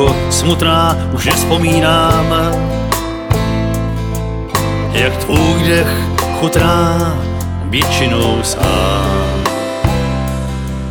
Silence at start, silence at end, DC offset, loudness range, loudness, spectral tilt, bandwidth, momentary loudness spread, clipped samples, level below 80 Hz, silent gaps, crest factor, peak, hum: 0 s; 0 s; under 0.1%; 2 LU; -14 LUFS; -5 dB/octave; 19 kHz; 7 LU; under 0.1%; -24 dBFS; none; 14 dB; 0 dBFS; none